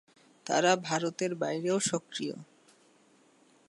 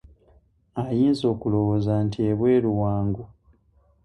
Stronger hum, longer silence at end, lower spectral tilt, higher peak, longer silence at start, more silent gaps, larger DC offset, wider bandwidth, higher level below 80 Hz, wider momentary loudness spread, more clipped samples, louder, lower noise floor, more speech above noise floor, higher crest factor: neither; first, 1.25 s vs 0.8 s; second, -3.5 dB/octave vs -9 dB/octave; about the same, -12 dBFS vs -10 dBFS; second, 0.45 s vs 0.75 s; neither; neither; about the same, 11.5 kHz vs 10.5 kHz; second, -82 dBFS vs -48 dBFS; about the same, 12 LU vs 10 LU; neither; second, -30 LUFS vs -23 LUFS; about the same, -64 dBFS vs -61 dBFS; second, 34 dB vs 39 dB; first, 20 dB vs 14 dB